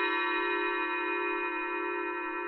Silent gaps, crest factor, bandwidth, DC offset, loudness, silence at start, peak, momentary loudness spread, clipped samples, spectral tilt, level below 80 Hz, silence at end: none; 12 dB; 5.8 kHz; under 0.1%; -31 LUFS; 0 s; -18 dBFS; 4 LU; under 0.1%; -4.5 dB/octave; -70 dBFS; 0 s